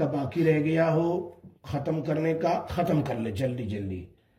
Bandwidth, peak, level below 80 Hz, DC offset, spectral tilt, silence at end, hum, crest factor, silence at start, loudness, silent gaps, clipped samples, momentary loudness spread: 14.5 kHz; -10 dBFS; -58 dBFS; under 0.1%; -8 dB/octave; 0.3 s; none; 16 dB; 0 s; -27 LUFS; none; under 0.1%; 11 LU